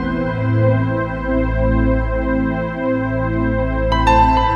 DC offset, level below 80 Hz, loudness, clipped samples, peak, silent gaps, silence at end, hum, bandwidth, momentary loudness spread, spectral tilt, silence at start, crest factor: under 0.1%; -24 dBFS; -17 LUFS; under 0.1%; -2 dBFS; none; 0 s; none; 6.8 kHz; 7 LU; -8 dB/octave; 0 s; 14 dB